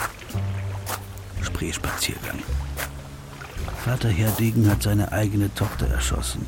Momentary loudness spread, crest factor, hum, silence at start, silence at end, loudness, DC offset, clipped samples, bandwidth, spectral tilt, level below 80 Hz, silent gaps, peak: 13 LU; 16 dB; none; 0 s; 0 s; -25 LUFS; under 0.1%; under 0.1%; 17 kHz; -5 dB/octave; -32 dBFS; none; -8 dBFS